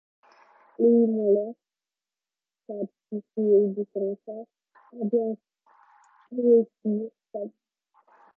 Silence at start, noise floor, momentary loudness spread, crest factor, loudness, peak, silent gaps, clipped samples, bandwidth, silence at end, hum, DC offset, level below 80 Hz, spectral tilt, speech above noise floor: 0.8 s; under -90 dBFS; 17 LU; 18 dB; -25 LUFS; -10 dBFS; none; under 0.1%; 2.1 kHz; 0.9 s; none; under 0.1%; under -90 dBFS; -12.5 dB/octave; over 65 dB